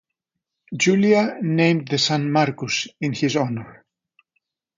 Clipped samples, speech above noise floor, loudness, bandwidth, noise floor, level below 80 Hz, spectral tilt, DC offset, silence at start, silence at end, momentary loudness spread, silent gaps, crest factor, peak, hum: under 0.1%; 62 dB; -20 LUFS; 9.4 kHz; -82 dBFS; -64 dBFS; -5 dB/octave; under 0.1%; 0.7 s; 1.05 s; 9 LU; none; 18 dB; -4 dBFS; none